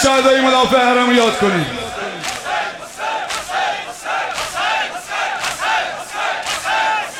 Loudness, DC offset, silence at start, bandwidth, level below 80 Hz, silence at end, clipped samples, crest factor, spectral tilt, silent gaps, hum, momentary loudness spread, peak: -17 LUFS; under 0.1%; 0 s; 16.5 kHz; -48 dBFS; 0 s; under 0.1%; 16 dB; -3 dB/octave; none; none; 11 LU; 0 dBFS